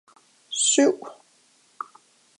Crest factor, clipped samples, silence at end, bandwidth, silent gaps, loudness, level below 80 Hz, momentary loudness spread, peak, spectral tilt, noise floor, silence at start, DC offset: 22 dB; under 0.1%; 1.25 s; 11 kHz; none; -21 LUFS; -88 dBFS; 21 LU; -6 dBFS; -0.5 dB/octave; -61 dBFS; 0.5 s; under 0.1%